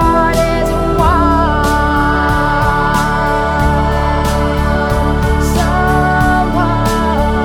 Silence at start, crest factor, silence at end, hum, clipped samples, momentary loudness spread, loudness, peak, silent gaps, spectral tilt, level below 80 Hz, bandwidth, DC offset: 0 s; 12 dB; 0 s; none; under 0.1%; 3 LU; -13 LUFS; 0 dBFS; none; -6 dB/octave; -18 dBFS; 17.5 kHz; under 0.1%